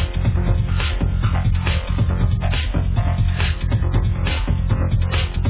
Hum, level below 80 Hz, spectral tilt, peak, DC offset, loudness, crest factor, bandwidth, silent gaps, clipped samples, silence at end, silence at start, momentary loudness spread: none; -22 dBFS; -10.5 dB/octave; -6 dBFS; under 0.1%; -20 LUFS; 12 dB; 4 kHz; none; under 0.1%; 0 s; 0 s; 2 LU